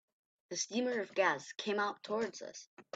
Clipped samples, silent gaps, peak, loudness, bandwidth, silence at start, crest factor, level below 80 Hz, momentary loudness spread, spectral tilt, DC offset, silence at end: under 0.1%; 2.67-2.77 s; -18 dBFS; -36 LUFS; 9 kHz; 0.5 s; 20 dB; -86 dBFS; 14 LU; -2.5 dB/octave; under 0.1%; 0.15 s